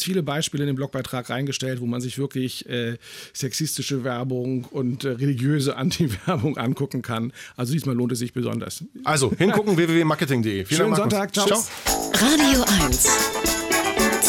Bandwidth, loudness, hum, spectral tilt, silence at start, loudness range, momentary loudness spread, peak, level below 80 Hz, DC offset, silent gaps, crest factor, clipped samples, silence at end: 19 kHz; -22 LUFS; none; -4 dB/octave; 0 s; 8 LU; 11 LU; -6 dBFS; -42 dBFS; under 0.1%; none; 16 dB; under 0.1%; 0 s